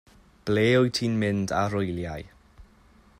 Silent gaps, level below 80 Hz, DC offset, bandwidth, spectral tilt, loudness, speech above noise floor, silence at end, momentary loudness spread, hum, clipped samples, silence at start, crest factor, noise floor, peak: none; -54 dBFS; under 0.1%; 15.5 kHz; -6 dB/octave; -25 LUFS; 32 dB; 0.55 s; 15 LU; none; under 0.1%; 0.45 s; 16 dB; -56 dBFS; -10 dBFS